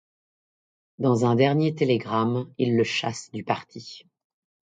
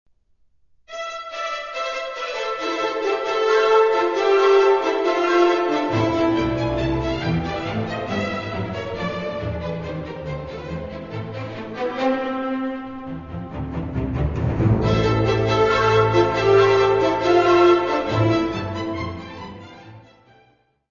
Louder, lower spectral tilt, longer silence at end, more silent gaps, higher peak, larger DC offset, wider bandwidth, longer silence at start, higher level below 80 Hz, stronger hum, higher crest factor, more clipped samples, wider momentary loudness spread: second, -24 LUFS vs -20 LUFS; about the same, -6.5 dB/octave vs -6.5 dB/octave; second, 0.7 s vs 0.9 s; neither; about the same, -6 dBFS vs -4 dBFS; second, under 0.1% vs 0.1%; first, 9.4 kHz vs 7.4 kHz; about the same, 1 s vs 0.9 s; second, -66 dBFS vs -40 dBFS; neither; about the same, 20 dB vs 16 dB; neither; about the same, 14 LU vs 15 LU